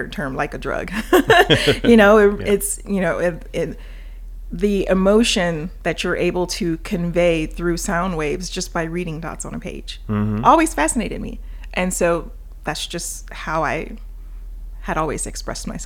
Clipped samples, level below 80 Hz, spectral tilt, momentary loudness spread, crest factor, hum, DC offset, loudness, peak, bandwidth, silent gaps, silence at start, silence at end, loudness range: under 0.1%; -32 dBFS; -4.5 dB/octave; 20 LU; 20 dB; none; under 0.1%; -19 LUFS; 0 dBFS; 18.5 kHz; none; 0 s; 0 s; 9 LU